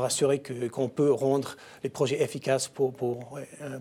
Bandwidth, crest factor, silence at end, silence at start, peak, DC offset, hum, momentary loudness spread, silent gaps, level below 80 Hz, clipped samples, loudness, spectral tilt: 16 kHz; 16 dB; 0 s; 0 s; -12 dBFS; under 0.1%; none; 13 LU; none; -72 dBFS; under 0.1%; -28 LUFS; -5 dB/octave